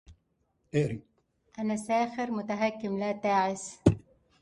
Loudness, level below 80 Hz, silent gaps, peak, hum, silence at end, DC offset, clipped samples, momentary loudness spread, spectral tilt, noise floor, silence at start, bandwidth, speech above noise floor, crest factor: -30 LUFS; -52 dBFS; none; -8 dBFS; none; 0.45 s; under 0.1%; under 0.1%; 8 LU; -6.5 dB/octave; -74 dBFS; 0.1 s; 11.5 kHz; 45 dB; 24 dB